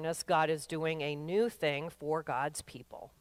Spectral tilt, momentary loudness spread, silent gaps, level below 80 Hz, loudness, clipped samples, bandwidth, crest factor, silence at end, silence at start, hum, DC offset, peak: -4.5 dB/octave; 15 LU; none; -68 dBFS; -34 LUFS; under 0.1%; 16 kHz; 16 dB; 0.15 s; 0 s; none; under 0.1%; -18 dBFS